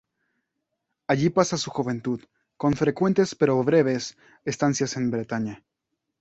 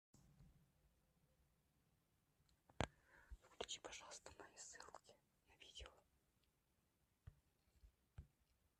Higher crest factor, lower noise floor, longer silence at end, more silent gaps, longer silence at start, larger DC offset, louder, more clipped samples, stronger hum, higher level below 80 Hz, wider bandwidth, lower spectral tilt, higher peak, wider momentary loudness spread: second, 20 dB vs 40 dB; second, -81 dBFS vs -85 dBFS; first, 0.65 s vs 0.5 s; neither; first, 1.1 s vs 0.15 s; neither; first, -24 LUFS vs -55 LUFS; neither; neither; first, -58 dBFS vs -70 dBFS; second, 8.2 kHz vs 13 kHz; first, -5.5 dB/octave vs -3 dB/octave; first, -4 dBFS vs -22 dBFS; second, 12 LU vs 17 LU